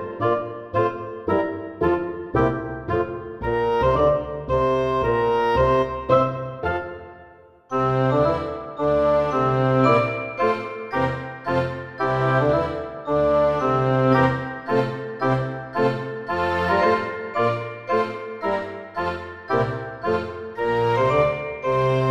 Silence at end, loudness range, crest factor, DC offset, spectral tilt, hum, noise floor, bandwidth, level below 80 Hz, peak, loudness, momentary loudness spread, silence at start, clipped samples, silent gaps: 0 s; 3 LU; 16 dB; under 0.1%; -8 dB/octave; none; -48 dBFS; 8 kHz; -44 dBFS; -6 dBFS; -22 LUFS; 9 LU; 0 s; under 0.1%; none